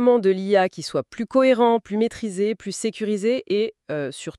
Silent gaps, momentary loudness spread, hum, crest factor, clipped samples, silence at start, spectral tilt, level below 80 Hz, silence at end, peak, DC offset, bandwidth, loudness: none; 10 LU; none; 16 dB; under 0.1%; 0 s; -5 dB/octave; -62 dBFS; 0.1 s; -6 dBFS; under 0.1%; 12 kHz; -22 LUFS